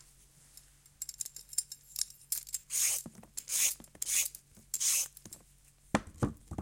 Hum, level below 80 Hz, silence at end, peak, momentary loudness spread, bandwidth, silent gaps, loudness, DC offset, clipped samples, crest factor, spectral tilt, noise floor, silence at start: none; -60 dBFS; 0 s; -12 dBFS; 15 LU; 17 kHz; none; -33 LUFS; under 0.1%; under 0.1%; 26 dB; -1.5 dB/octave; -63 dBFS; 1 s